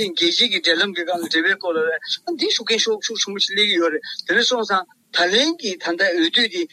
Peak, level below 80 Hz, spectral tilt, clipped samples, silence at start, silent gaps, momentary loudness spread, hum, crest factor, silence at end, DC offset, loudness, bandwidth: -4 dBFS; -68 dBFS; -1.5 dB/octave; under 0.1%; 0 s; none; 8 LU; none; 16 dB; 0.05 s; under 0.1%; -18 LUFS; 14 kHz